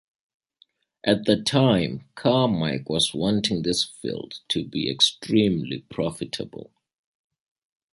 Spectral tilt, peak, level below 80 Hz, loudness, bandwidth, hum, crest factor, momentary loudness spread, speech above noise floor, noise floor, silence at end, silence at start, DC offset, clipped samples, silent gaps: -5 dB/octave; -4 dBFS; -56 dBFS; -23 LUFS; 11.5 kHz; none; 22 dB; 12 LU; 39 dB; -63 dBFS; 1.3 s; 1.05 s; under 0.1%; under 0.1%; none